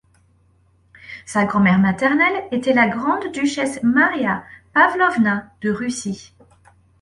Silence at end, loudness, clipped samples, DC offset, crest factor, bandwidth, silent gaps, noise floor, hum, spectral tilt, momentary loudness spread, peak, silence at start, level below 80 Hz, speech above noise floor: 0.8 s; -18 LUFS; under 0.1%; under 0.1%; 18 dB; 11.5 kHz; none; -57 dBFS; none; -5.5 dB/octave; 11 LU; -2 dBFS; 1.05 s; -56 dBFS; 39 dB